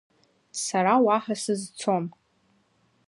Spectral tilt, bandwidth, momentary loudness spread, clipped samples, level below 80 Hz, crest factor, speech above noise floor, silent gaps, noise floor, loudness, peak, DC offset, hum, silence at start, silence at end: -4.5 dB/octave; 11.5 kHz; 12 LU; under 0.1%; -76 dBFS; 20 dB; 42 dB; none; -67 dBFS; -25 LUFS; -8 dBFS; under 0.1%; none; 0.55 s; 1 s